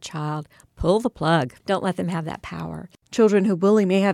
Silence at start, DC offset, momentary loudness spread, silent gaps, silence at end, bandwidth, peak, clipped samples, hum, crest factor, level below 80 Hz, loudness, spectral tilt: 0 s; under 0.1%; 15 LU; none; 0 s; 13 kHz; -6 dBFS; under 0.1%; none; 14 dB; -46 dBFS; -22 LUFS; -6.5 dB/octave